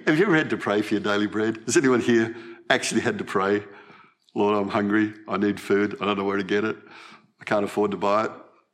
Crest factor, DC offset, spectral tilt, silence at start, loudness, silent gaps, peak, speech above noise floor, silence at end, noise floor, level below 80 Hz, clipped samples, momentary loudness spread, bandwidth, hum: 22 dB; under 0.1%; -4.5 dB/octave; 0 s; -24 LUFS; none; -2 dBFS; 29 dB; 0.3 s; -53 dBFS; -72 dBFS; under 0.1%; 8 LU; 14 kHz; none